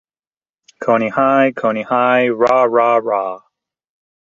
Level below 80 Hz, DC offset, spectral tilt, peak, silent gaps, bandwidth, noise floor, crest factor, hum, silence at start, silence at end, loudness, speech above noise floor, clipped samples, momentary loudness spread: -60 dBFS; under 0.1%; -6.5 dB/octave; -2 dBFS; none; 7.4 kHz; under -90 dBFS; 16 dB; none; 0.8 s; 0.85 s; -15 LUFS; over 76 dB; under 0.1%; 8 LU